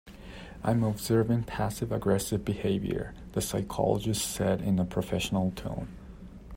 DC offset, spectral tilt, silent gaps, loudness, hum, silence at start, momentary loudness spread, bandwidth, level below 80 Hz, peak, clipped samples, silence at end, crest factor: under 0.1%; -5.5 dB/octave; none; -30 LUFS; none; 0.05 s; 15 LU; 16 kHz; -48 dBFS; -12 dBFS; under 0.1%; 0 s; 18 dB